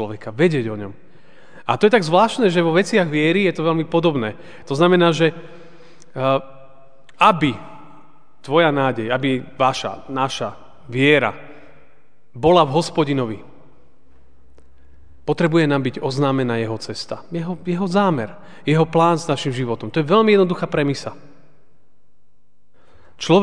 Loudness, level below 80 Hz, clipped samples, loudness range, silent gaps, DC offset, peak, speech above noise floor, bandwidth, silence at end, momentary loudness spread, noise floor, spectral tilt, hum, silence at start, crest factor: -18 LUFS; -56 dBFS; under 0.1%; 5 LU; none; 1%; 0 dBFS; 46 dB; 10 kHz; 0 s; 13 LU; -64 dBFS; -6 dB/octave; none; 0 s; 20 dB